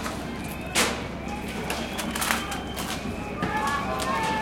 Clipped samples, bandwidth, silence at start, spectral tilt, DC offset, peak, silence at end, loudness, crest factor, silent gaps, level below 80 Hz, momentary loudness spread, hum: under 0.1%; 17 kHz; 0 s; -3 dB/octave; under 0.1%; -4 dBFS; 0 s; -28 LUFS; 26 dB; none; -42 dBFS; 9 LU; none